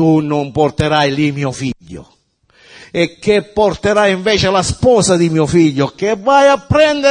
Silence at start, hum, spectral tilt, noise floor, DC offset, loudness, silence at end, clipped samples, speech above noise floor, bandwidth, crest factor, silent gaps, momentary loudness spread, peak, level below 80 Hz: 0 s; none; -5 dB/octave; -52 dBFS; under 0.1%; -13 LUFS; 0 s; under 0.1%; 39 dB; 10.5 kHz; 14 dB; none; 8 LU; 0 dBFS; -40 dBFS